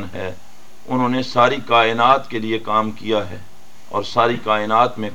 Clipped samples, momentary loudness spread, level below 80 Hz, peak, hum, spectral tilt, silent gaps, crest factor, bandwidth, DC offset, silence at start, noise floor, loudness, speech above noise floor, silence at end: under 0.1%; 14 LU; -58 dBFS; 0 dBFS; none; -5.5 dB/octave; none; 18 dB; 17 kHz; 3%; 0 s; -48 dBFS; -18 LUFS; 30 dB; 0 s